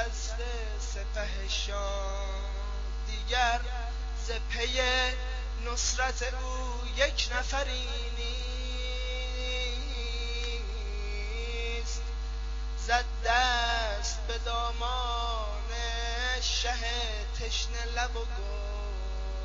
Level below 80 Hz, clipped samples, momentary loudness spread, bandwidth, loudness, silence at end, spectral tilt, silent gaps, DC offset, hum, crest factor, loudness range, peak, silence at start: -34 dBFS; under 0.1%; 9 LU; 7.6 kHz; -32 LUFS; 0 s; -1.5 dB/octave; none; under 0.1%; none; 20 dB; 4 LU; -10 dBFS; 0 s